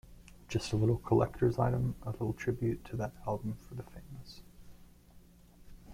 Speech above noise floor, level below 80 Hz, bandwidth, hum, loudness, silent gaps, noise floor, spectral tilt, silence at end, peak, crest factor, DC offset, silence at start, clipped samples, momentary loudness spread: 25 dB; -52 dBFS; 15.5 kHz; none; -34 LUFS; none; -58 dBFS; -7.5 dB/octave; 0 s; -16 dBFS; 20 dB; under 0.1%; 0.05 s; under 0.1%; 20 LU